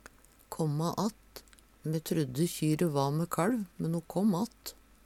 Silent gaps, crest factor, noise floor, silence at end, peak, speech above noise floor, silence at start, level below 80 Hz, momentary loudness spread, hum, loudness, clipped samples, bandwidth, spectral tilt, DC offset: none; 18 dB; -57 dBFS; 0.35 s; -16 dBFS; 26 dB; 0.5 s; -62 dBFS; 16 LU; none; -32 LUFS; under 0.1%; 16.5 kHz; -6.5 dB/octave; under 0.1%